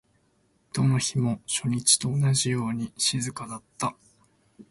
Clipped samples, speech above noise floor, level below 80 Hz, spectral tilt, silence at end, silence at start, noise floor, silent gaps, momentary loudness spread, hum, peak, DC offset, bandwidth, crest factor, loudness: under 0.1%; 41 dB; -60 dBFS; -3.5 dB/octave; 0.1 s; 0.75 s; -67 dBFS; none; 12 LU; none; -6 dBFS; under 0.1%; 11.5 kHz; 22 dB; -25 LUFS